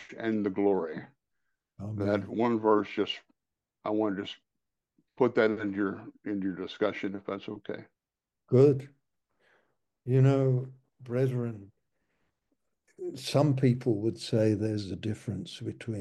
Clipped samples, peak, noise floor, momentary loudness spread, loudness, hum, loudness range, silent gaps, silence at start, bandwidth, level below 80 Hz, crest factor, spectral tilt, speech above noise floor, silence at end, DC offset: under 0.1%; -10 dBFS; -89 dBFS; 16 LU; -29 LUFS; none; 3 LU; none; 0 s; 12 kHz; -72 dBFS; 20 dB; -7.5 dB/octave; 60 dB; 0 s; under 0.1%